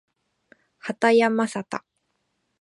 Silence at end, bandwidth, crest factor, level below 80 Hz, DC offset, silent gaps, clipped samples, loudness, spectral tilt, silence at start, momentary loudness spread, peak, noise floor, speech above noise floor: 0.85 s; 11 kHz; 20 dB; -78 dBFS; under 0.1%; none; under 0.1%; -21 LUFS; -5 dB/octave; 0.85 s; 16 LU; -6 dBFS; -74 dBFS; 53 dB